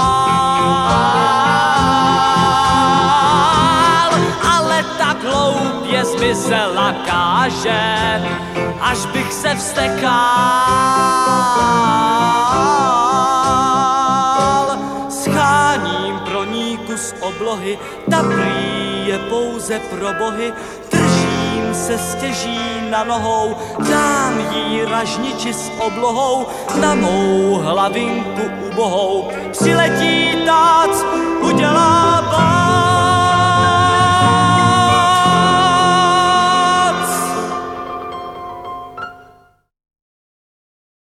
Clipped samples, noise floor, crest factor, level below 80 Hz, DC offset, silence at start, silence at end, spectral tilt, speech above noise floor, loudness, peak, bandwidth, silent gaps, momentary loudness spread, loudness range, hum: under 0.1%; -49 dBFS; 14 dB; -42 dBFS; under 0.1%; 0 s; 1.8 s; -4 dB/octave; 34 dB; -14 LUFS; 0 dBFS; 15.5 kHz; none; 10 LU; 7 LU; none